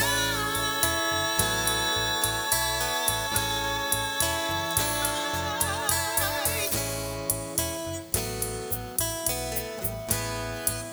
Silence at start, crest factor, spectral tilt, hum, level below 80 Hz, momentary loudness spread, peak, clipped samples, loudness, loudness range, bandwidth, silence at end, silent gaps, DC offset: 0 s; 22 dB; -2 dB/octave; none; -44 dBFS; 6 LU; -6 dBFS; under 0.1%; -26 LUFS; 4 LU; over 20 kHz; 0 s; none; under 0.1%